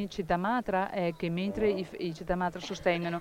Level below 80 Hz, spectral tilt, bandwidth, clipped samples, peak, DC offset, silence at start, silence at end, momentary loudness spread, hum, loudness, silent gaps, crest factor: -52 dBFS; -6.5 dB/octave; 16 kHz; under 0.1%; -14 dBFS; under 0.1%; 0 s; 0 s; 5 LU; none; -31 LUFS; none; 18 dB